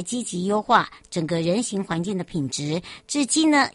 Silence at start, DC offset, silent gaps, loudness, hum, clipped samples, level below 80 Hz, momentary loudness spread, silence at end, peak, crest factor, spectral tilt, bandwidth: 0 s; under 0.1%; none; -23 LUFS; none; under 0.1%; -58 dBFS; 9 LU; 0.05 s; -2 dBFS; 20 dB; -4 dB/octave; 11.5 kHz